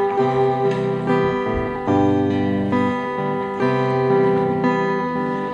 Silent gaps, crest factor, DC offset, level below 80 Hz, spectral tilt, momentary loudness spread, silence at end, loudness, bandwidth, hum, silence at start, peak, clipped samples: none; 12 dB; under 0.1%; -44 dBFS; -8 dB/octave; 6 LU; 0 s; -20 LUFS; 7.6 kHz; none; 0 s; -8 dBFS; under 0.1%